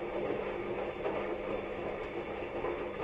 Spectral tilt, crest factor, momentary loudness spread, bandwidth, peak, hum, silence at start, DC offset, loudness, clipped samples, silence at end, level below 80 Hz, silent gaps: -7.5 dB/octave; 14 dB; 3 LU; 7.8 kHz; -24 dBFS; none; 0 s; under 0.1%; -37 LUFS; under 0.1%; 0 s; -56 dBFS; none